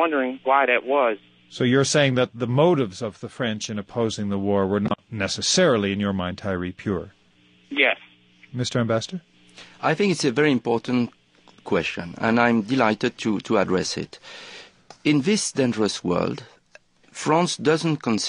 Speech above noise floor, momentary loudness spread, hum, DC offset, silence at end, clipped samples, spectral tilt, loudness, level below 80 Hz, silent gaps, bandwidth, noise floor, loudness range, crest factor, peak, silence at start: 35 dB; 13 LU; none; under 0.1%; 0 s; under 0.1%; -4.5 dB/octave; -22 LUFS; -54 dBFS; none; 11 kHz; -57 dBFS; 3 LU; 20 dB; -2 dBFS; 0 s